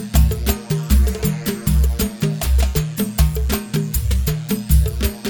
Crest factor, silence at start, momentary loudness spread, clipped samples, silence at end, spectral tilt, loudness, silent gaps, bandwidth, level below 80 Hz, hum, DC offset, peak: 14 dB; 0 s; 5 LU; under 0.1%; 0 s; -5.5 dB/octave; -19 LUFS; none; 19 kHz; -20 dBFS; none; under 0.1%; -2 dBFS